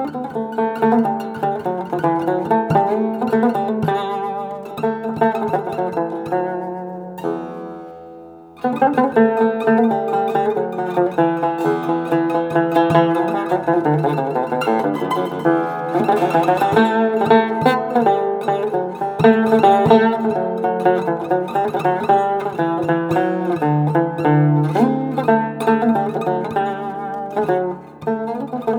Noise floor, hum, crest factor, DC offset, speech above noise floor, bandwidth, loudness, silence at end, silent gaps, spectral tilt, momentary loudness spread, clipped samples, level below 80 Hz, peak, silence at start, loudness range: -39 dBFS; none; 18 dB; under 0.1%; 20 dB; 18 kHz; -18 LUFS; 0 s; none; -8 dB/octave; 10 LU; under 0.1%; -60 dBFS; 0 dBFS; 0 s; 5 LU